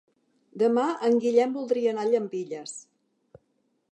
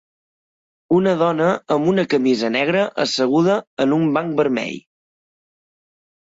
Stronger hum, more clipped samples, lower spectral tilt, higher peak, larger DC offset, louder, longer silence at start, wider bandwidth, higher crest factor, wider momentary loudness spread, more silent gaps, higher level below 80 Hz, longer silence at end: neither; neither; about the same, -5 dB/octave vs -6 dB/octave; second, -10 dBFS vs -6 dBFS; neither; second, -25 LUFS vs -18 LUFS; second, 0.55 s vs 0.9 s; about the same, 8.8 kHz vs 8 kHz; about the same, 18 dB vs 14 dB; first, 14 LU vs 3 LU; second, none vs 3.67-3.77 s; second, -80 dBFS vs -62 dBFS; second, 1.1 s vs 1.45 s